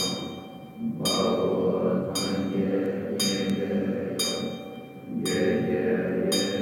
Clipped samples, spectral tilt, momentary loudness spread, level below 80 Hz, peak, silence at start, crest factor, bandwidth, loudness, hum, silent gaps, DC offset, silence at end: under 0.1%; -4.5 dB/octave; 11 LU; -64 dBFS; -12 dBFS; 0 s; 14 dB; 18 kHz; -26 LUFS; none; none; under 0.1%; 0 s